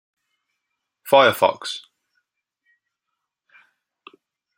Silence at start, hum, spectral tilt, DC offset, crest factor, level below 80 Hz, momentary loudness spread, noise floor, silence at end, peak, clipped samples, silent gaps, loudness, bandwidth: 1.05 s; none; -3.5 dB/octave; under 0.1%; 24 dB; -72 dBFS; 19 LU; -81 dBFS; 2.8 s; -2 dBFS; under 0.1%; none; -18 LUFS; 16 kHz